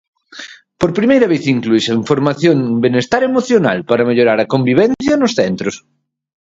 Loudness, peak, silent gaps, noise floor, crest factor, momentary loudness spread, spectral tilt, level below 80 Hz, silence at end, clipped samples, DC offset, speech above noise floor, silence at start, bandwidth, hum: -14 LUFS; 0 dBFS; none; -35 dBFS; 14 dB; 10 LU; -6 dB/octave; -50 dBFS; 0.7 s; under 0.1%; under 0.1%; 22 dB; 0.35 s; 7.8 kHz; none